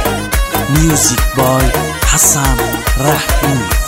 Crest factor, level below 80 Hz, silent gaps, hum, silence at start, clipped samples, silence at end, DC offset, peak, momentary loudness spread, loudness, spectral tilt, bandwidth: 12 dB; -18 dBFS; none; none; 0 s; under 0.1%; 0 s; under 0.1%; 0 dBFS; 6 LU; -12 LUFS; -3.5 dB/octave; 16.5 kHz